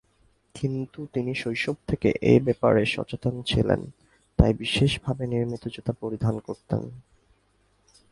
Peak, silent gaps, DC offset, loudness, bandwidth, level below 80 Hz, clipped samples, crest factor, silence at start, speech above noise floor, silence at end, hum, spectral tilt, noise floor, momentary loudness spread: 0 dBFS; none; under 0.1%; -26 LUFS; 11.5 kHz; -40 dBFS; under 0.1%; 26 dB; 0.55 s; 41 dB; 1.1 s; none; -6.5 dB/octave; -66 dBFS; 11 LU